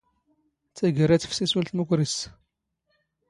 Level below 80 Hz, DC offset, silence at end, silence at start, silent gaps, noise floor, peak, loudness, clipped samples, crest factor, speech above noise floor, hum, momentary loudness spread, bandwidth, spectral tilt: -58 dBFS; under 0.1%; 1 s; 0.75 s; none; -76 dBFS; -8 dBFS; -24 LUFS; under 0.1%; 20 dB; 52 dB; none; 7 LU; 11.5 kHz; -5.5 dB/octave